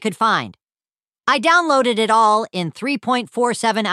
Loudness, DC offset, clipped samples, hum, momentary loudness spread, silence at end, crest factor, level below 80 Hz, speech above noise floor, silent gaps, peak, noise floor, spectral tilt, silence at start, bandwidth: -17 LUFS; under 0.1%; under 0.1%; none; 10 LU; 0 s; 16 dB; -70 dBFS; over 73 dB; 1.07-1.11 s; -2 dBFS; under -90 dBFS; -3.5 dB/octave; 0 s; 13.5 kHz